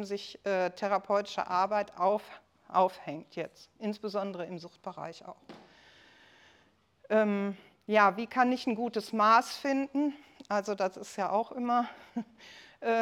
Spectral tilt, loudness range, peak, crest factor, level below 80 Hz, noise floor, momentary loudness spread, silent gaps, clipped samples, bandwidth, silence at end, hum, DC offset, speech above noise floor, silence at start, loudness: -5 dB/octave; 12 LU; -10 dBFS; 22 dB; -78 dBFS; -67 dBFS; 18 LU; none; under 0.1%; 16.5 kHz; 0 s; none; under 0.1%; 36 dB; 0 s; -31 LUFS